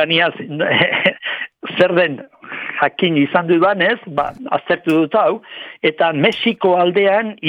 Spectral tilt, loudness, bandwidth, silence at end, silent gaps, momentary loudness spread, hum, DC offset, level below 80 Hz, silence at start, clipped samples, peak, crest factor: -6.5 dB/octave; -16 LUFS; 10.5 kHz; 0 s; none; 11 LU; none; under 0.1%; -60 dBFS; 0 s; under 0.1%; 0 dBFS; 16 dB